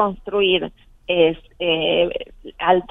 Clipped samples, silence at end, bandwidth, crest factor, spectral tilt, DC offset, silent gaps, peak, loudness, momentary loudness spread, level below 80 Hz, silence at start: under 0.1%; 0.05 s; 3.9 kHz; 18 dB; -7.5 dB/octave; under 0.1%; none; -2 dBFS; -19 LUFS; 14 LU; -46 dBFS; 0 s